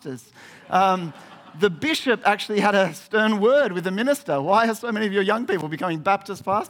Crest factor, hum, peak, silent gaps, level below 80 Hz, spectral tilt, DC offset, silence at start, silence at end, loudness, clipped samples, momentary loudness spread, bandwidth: 18 dB; none; -4 dBFS; none; -68 dBFS; -5 dB/octave; under 0.1%; 0.05 s; 0 s; -21 LUFS; under 0.1%; 6 LU; 18 kHz